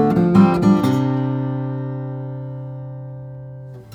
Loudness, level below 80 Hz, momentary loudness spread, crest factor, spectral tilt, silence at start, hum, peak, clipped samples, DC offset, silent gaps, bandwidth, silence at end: -18 LUFS; -50 dBFS; 21 LU; 18 dB; -9 dB/octave; 0 s; none; -2 dBFS; under 0.1%; under 0.1%; none; 14 kHz; 0 s